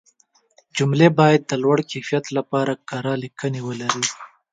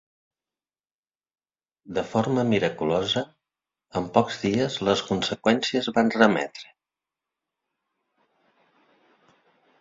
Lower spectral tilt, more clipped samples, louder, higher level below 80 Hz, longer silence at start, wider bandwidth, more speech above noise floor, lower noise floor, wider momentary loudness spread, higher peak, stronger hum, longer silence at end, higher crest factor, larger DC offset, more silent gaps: about the same, -5 dB/octave vs -5 dB/octave; neither; first, -20 LUFS vs -24 LUFS; about the same, -64 dBFS vs -60 dBFS; second, 0.75 s vs 1.85 s; first, 9.4 kHz vs 7.8 kHz; second, 41 dB vs over 66 dB; second, -60 dBFS vs under -90 dBFS; about the same, 11 LU vs 11 LU; about the same, 0 dBFS vs -2 dBFS; neither; second, 0.25 s vs 3.15 s; about the same, 20 dB vs 24 dB; neither; neither